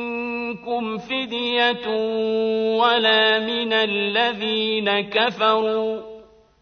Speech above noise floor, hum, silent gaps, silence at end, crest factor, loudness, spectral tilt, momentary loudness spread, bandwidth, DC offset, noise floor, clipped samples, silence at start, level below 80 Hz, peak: 24 dB; none; none; 0.4 s; 16 dB; -20 LUFS; -5 dB/octave; 10 LU; 6.6 kHz; under 0.1%; -45 dBFS; under 0.1%; 0 s; -62 dBFS; -4 dBFS